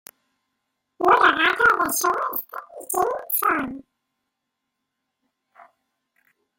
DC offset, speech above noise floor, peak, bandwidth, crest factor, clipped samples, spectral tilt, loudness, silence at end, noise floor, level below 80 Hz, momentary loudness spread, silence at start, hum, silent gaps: under 0.1%; 55 dB; -4 dBFS; 17 kHz; 22 dB; under 0.1%; -1.5 dB/octave; -20 LUFS; 2.75 s; -80 dBFS; -60 dBFS; 17 LU; 1 s; none; none